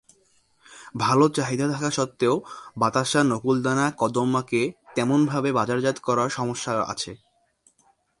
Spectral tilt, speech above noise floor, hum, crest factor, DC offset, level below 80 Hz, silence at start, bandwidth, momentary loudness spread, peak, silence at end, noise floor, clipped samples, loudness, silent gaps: -5 dB/octave; 41 dB; none; 18 dB; under 0.1%; -62 dBFS; 0.7 s; 11.5 kHz; 7 LU; -6 dBFS; 1.05 s; -64 dBFS; under 0.1%; -24 LUFS; none